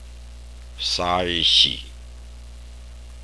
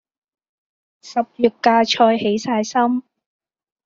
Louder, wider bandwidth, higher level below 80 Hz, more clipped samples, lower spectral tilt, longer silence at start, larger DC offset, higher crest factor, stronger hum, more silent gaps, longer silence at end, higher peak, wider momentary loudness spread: about the same, -18 LUFS vs -18 LUFS; first, 11 kHz vs 7.6 kHz; first, -40 dBFS vs -66 dBFS; neither; second, -2.5 dB/octave vs -4 dB/octave; second, 0 s vs 1.05 s; first, 0.3% vs under 0.1%; about the same, 22 dB vs 18 dB; first, 60 Hz at -40 dBFS vs none; neither; second, 0 s vs 0.85 s; about the same, -2 dBFS vs -2 dBFS; first, 23 LU vs 9 LU